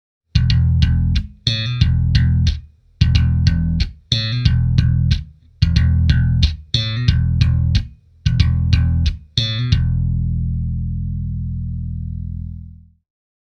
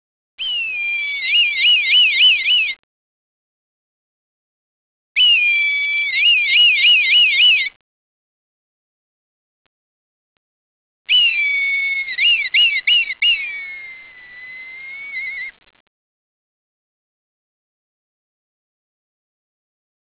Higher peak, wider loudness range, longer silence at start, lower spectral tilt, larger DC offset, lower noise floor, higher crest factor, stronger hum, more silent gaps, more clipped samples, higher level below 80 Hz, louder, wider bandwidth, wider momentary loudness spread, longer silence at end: first, 0 dBFS vs -6 dBFS; second, 4 LU vs 19 LU; about the same, 0.35 s vs 0.4 s; first, -6 dB/octave vs 8 dB/octave; neither; about the same, -38 dBFS vs -39 dBFS; about the same, 16 dB vs 14 dB; neither; second, none vs 2.79-5.15 s, 7.76-11.05 s; neither; first, -22 dBFS vs -64 dBFS; second, -18 LUFS vs -12 LUFS; first, 6.8 kHz vs 4 kHz; second, 10 LU vs 19 LU; second, 0.65 s vs 4.7 s